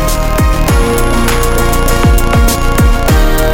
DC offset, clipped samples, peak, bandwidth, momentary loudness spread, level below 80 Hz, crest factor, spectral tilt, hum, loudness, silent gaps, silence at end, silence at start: under 0.1%; under 0.1%; 0 dBFS; 17 kHz; 2 LU; -10 dBFS; 8 dB; -5 dB/octave; none; -11 LUFS; none; 0 s; 0 s